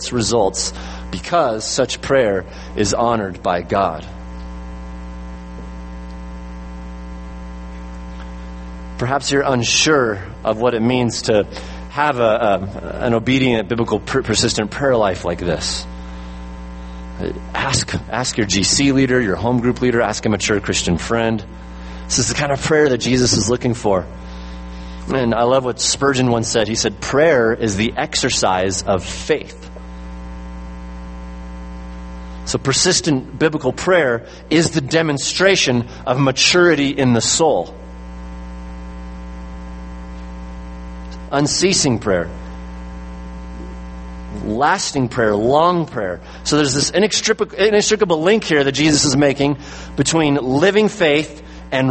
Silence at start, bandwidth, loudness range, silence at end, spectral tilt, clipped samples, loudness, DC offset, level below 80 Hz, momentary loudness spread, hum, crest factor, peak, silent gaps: 0 s; 8.8 kHz; 10 LU; 0 s; -4 dB/octave; under 0.1%; -17 LUFS; under 0.1%; -34 dBFS; 19 LU; none; 18 dB; 0 dBFS; none